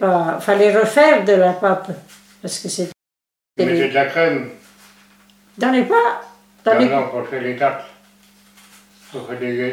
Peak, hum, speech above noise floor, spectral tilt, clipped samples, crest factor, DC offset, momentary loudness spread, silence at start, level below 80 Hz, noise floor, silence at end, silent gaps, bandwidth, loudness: 0 dBFS; none; 70 dB; -5 dB/octave; under 0.1%; 18 dB; under 0.1%; 19 LU; 0 s; -70 dBFS; -86 dBFS; 0 s; none; 16 kHz; -17 LUFS